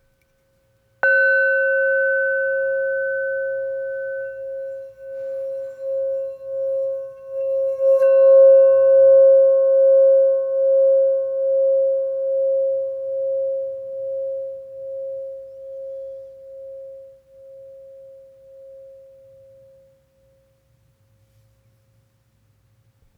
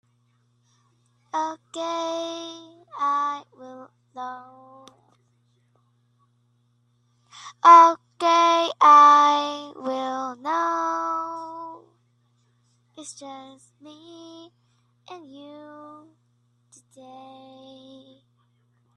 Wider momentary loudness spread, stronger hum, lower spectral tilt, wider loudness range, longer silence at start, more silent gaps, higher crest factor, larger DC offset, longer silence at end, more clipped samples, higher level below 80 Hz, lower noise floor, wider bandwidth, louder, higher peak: second, 22 LU vs 31 LU; neither; first, -4.5 dB/octave vs -2 dB/octave; about the same, 20 LU vs 18 LU; second, 1.05 s vs 1.35 s; neither; second, 14 dB vs 22 dB; neither; first, 4.25 s vs 3.1 s; neither; first, -70 dBFS vs -82 dBFS; about the same, -63 dBFS vs -66 dBFS; second, 4.3 kHz vs 10.5 kHz; about the same, -18 LUFS vs -19 LUFS; second, -6 dBFS vs -2 dBFS